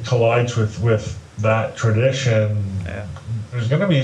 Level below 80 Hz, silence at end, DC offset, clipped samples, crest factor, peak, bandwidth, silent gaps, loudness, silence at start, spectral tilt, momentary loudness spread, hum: -46 dBFS; 0 s; under 0.1%; under 0.1%; 14 dB; -4 dBFS; 8.8 kHz; none; -20 LUFS; 0 s; -6.5 dB/octave; 12 LU; none